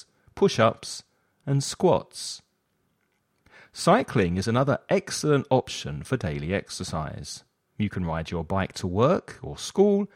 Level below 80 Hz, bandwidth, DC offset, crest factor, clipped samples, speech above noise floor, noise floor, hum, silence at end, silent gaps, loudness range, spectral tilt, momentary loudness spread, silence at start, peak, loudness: -50 dBFS; 15.5 kHz; under 0.1%; 20 dB; under 0.1%; 47 dB; -72 dBFS; none; 0.1 s; none; 5 LU; -5.5 dB/octave; 15 LU; 0.35 s; -6 dBFS; -26 LUFS